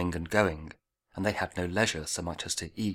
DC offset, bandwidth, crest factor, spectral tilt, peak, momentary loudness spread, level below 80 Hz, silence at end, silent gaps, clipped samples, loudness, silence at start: under 0.1%; 18 kHz; 22 dB; -4 dB/octave; -10 dBFS; 12 LU; -50 dBFS; 0 s; none; under 0.1%; -30 LUFS; 0 s